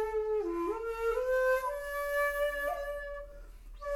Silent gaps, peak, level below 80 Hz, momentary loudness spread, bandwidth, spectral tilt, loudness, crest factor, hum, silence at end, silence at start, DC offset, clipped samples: none; -20 dBFS; -50 dBFS; 13 LU; 17.5 kHz; -4 dB/octave; -33 LUFS; 14 dB; none; 0 s; 0 s; under 0.1%; under 0.1%